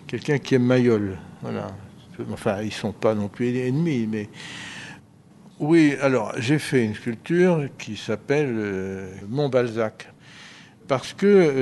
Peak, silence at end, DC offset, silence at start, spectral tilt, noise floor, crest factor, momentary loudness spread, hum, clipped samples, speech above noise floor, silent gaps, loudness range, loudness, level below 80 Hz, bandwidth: -4 dBFS; 0 s; under 0.1%; 0.05 s; -6.5 dB/octave; -50 dBFS; 20 dB; 18 LU; none; under 0.1%; 28 dB; none; 4 LU; -23 LUFS; -62 dBFS; 12 kHz